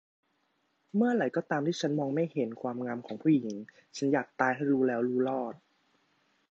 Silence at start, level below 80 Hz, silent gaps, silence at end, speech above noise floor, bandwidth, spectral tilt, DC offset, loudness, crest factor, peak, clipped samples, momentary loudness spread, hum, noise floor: 0.95 s; -82 dBFS; none; 0.95 s; 45 dB; 8 kHz; -6.5 dB/octave; under 0.1%; -30 LUFS; 22 dB; -10 dBFS; under 0.1%; 9 LU; none; -75 dBFS